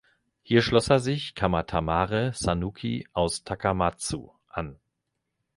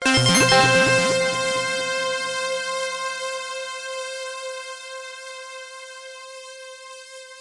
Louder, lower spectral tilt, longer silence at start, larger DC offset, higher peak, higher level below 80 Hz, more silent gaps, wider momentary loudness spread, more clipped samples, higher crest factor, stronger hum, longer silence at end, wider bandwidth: second, -26 LUFS vs -20 LUFS; first, -5 dB/octave vs -3 dB/octave; first, 0.5 s vs 0 s; neither; about the same, -6 dBFS vs -4 dBFS; first, -44 dBFS vs -52 dBFS; neither; second, 14 LU vs 23 LU; neither; about the same, 22 dB vs 20 dB; neither; first, 0.85 s vs 0 s; about the same, 11.5 kHz vs 11.5 kHz